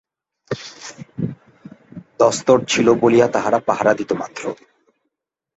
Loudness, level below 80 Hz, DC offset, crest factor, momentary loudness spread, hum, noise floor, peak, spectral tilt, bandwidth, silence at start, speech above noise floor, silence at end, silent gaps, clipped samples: -17 LUFS; -58 dBFS; under 0.1%; 18 dB; 19 LU; none; -80 dBFS; -2 dBFS; -4.5 dB/octave; 8.2 kHz; 0.5 s; 64 dB; 1 s; none; under 0.1%